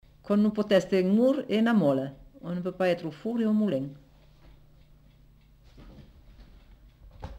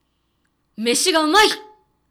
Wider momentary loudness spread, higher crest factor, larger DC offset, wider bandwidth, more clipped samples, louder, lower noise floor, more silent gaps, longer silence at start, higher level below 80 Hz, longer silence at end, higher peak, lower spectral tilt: first, 14 LU vs 11 LU; about the same, 18 dB vs 14 dB; neither; second, 12 kHz vs over 20 kHz; neither; second, -26 LUFS vs -16 LUFS; second, -57 dBFS vs -68 dBFS; neither; second, 0.25 s vs 0.8 s; about the same, -56 dBFS vs -54 dBFS; second, 0 s vs 0.5 s; second, -12 dBFS vs -6 dBFS; first, -7.5 dB/octave vs -1 dB/octave